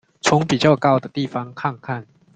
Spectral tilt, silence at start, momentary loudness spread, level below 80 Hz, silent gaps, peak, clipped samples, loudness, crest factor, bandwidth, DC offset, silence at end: -5.5 dB/octave; 0.25 s; 14 LU; -54 dBFS; none; -2 dBFS; under 0.1%; -19 LUFS; 18 dB; 9.4 kHz; under 0.1%; 0.3 s